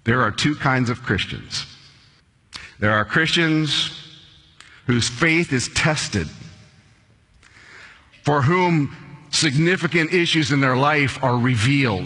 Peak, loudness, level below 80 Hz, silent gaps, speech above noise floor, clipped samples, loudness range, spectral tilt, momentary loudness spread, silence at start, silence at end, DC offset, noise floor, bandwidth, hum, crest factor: -2 dBFS; -19 LUFS; -48 dBFS; none; 36 dB; under 0.1%; 5 LU; -4.5 dB/octave; 11 LU; 0.05 s; 0 s; under 0.1%; -55 dBFS; 11 kHz; none; 18 dB